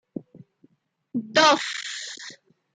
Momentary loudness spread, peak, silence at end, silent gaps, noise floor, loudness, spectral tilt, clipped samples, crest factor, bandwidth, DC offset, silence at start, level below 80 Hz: 23 LU; -6 dBFS; 0.4 s; none; -62 dBFS; -22 LUFS; -2 dB/octave; under 0.1%; 20 dB; 9.6 kHz; under 0.1%; 0.15 s; -78 dBFS